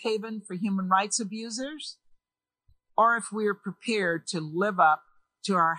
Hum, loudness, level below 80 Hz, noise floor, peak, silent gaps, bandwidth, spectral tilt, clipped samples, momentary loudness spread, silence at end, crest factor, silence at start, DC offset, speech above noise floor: none; -27 LUFS; -76 dBFS; under -90 dBFS; -8 dBFS; none; 13.5 kHz; -4 dB/octave; under 0.1%; 12 LU; 0 s; 20 dB; 0 s; under 0.1%; over 63 dB